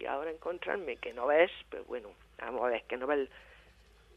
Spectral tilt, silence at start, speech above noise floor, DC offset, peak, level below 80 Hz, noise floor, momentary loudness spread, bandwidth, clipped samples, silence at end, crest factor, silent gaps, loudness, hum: -5.5 dB/octave; 0 s; 27 dB; under 0.1%; -10 dBFS; -64 dBFS; -61 dBFS; 16 LU; 7.6 kHz; under 0.1%; 0.55 s; 24 dB; none; -34 LUFS; none